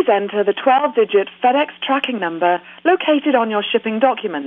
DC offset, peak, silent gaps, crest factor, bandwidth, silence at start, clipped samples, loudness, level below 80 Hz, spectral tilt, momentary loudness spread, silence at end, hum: under 0.1%; -4 dBFS; none; 14 dB; 4.1 kHz; 0 s; under 0.1%; -17 LUFS; -72 dBFS; -7 dB/octave; 4 LU; 0 s; none